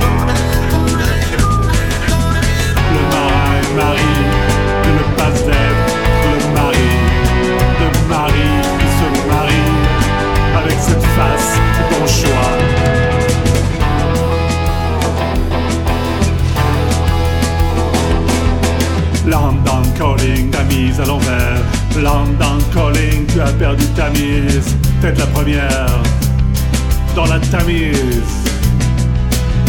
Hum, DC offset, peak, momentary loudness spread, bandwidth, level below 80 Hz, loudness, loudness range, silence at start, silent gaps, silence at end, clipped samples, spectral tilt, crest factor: none; under 0.1%; 0 dBFS; 3 LU; 19 kHz; -18 dBFS; -14 LUFS; 2 LU; 0 s; none; 0 s; under 0.1%; -5.5 dB/octave; 12 dB